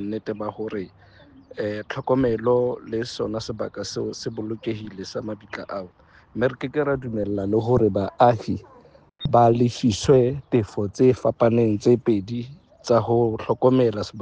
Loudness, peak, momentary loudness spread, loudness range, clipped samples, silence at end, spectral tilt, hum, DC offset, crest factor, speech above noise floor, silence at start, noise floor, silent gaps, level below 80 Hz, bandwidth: -22 LUFS; -4 dBFS; 14 LU; 9 LU; under 0.1%; 0 s; -7 dB/octave; none; under 0.1%; 18 dB; 29 dB; 0 s; -51 dBFS; none; -50 dBFS; 9.4 kHz